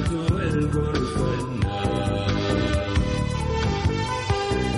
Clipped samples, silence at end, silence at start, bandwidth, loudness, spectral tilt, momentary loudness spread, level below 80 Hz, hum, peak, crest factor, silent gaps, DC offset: under 0.1%; 0 s; 0 s; 11.5 kHz; -24 LUFS; -6.5 dB/octave; 2 LU; -32 dBFS; none; -10 dBFS; 14 dB; none; under 0.1%